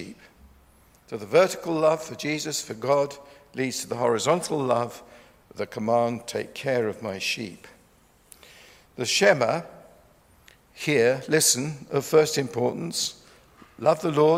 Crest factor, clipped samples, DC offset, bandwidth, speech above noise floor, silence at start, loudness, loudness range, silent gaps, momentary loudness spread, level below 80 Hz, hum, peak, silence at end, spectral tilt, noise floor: 22 dB; under 0.1%; under 0.1%; 16 kHz; 35 dB; 0 s; -24 LUFS; 5 LU; none; 14 LU; -64 dBFS; none; -4 dBFS; 0 s; -3.5 dB/octave; -59 dBFS